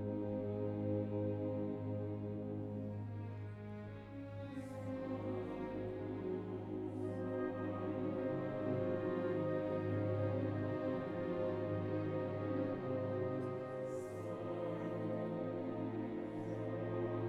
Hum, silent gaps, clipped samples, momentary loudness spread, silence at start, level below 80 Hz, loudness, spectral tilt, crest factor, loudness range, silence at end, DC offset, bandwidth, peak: none; none; under 0.1%; 7 LU; 0 s; -68 dBFS; -41 LUFS; -9.5 dB/octave; 14 dB; 6 LU; 0 s; under 0.1%; 9.4 kHz; -26 dBFS